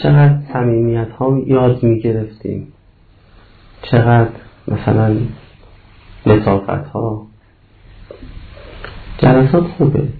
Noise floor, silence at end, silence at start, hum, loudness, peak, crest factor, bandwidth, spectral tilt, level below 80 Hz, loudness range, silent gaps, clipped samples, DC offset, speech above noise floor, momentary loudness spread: -47 dBFS; 0 s; 0 s; none; -14 LUFS; 0 dBFS; 16 dB; 4.7 kHz; -12 dB/octave; -36 dBFS; 4 LU; none; under 0.1%; under 0.1%; 34 dB; 22 LU